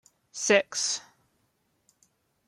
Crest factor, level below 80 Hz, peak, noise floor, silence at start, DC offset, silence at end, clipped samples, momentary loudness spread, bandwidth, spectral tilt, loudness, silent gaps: 22 dB; -82 dBFS; -10 dBFS; -73 dBFS; 0.35 s; under 0.1%; 1.45 s; under 0.1%; 12 LU; 13.5 kHz; -1 dB/octave; -26 LUFS; none